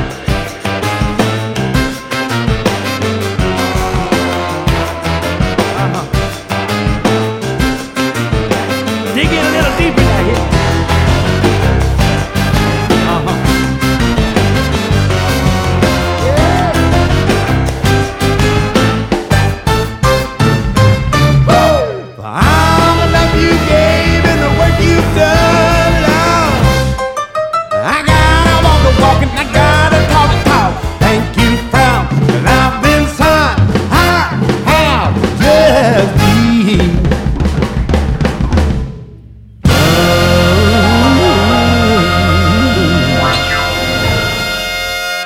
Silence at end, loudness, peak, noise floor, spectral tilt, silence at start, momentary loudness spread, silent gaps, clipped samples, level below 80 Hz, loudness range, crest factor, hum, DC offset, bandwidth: 0 s; -11 LUFS; 0 dBFS; -34 dBFS; -5.5 dB/octave; 0 s; 7 LU; none; under 0.1%; -20 dBFS; 5 LU; 10 dB; none; under 0.1%; 18 kHz